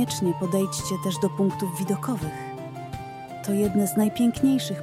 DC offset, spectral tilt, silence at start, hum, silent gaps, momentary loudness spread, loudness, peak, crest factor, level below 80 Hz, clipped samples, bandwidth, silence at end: under 0.1%; -5.5 dB/octave; 0 s; none; none; 14 LU; -25 LUFS; -10 dBFS; 14 dB; -52 dBFS; under 0.1%; 16.5 kHz; 0 s